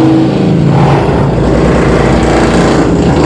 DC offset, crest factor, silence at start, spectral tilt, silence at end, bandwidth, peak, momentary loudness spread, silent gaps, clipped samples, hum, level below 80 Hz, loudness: under 0.1%; 8 dB; 0 s; -7 dB/octave; 0 s; 10.5 kHz; 0 dBFS; 1 LU; none; 0.2%; none; -18 dBFS; -8 LUFS